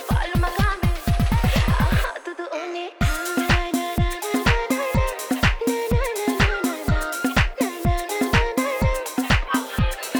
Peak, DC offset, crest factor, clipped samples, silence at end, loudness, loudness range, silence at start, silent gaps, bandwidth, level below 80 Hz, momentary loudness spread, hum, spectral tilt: -4 dBFS; under 0.1%; 18 dB; under 0.1%; 0 s; -22 LUFS; 1 LU; 0 s; none; over 20 kHz; -26 dBFS; 4 LU; none; -5 dB/octave